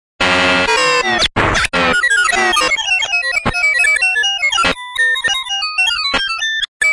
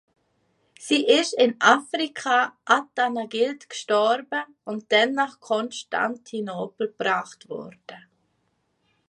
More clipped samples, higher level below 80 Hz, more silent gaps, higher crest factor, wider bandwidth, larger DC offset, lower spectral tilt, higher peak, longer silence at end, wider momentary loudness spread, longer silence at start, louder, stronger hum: neither; first, -36 dBFS vs -80 dBFS; first, 6.68-6.80 s vs none; second, 14 dB vs 22 dB; about the same, 11.5 kHz vs 11.5 kHz; neither; about the same, -1.5 dB/octave vs -2.5 dB/octave; about the same, 0 dBFS vs -2 dBFS; second, 0 s vs 1.1 s; second, 4 LU vs 16 LU; second, 0.2 s vs 0.8 s; first, -13 LUFS vs -23 LUFS; neither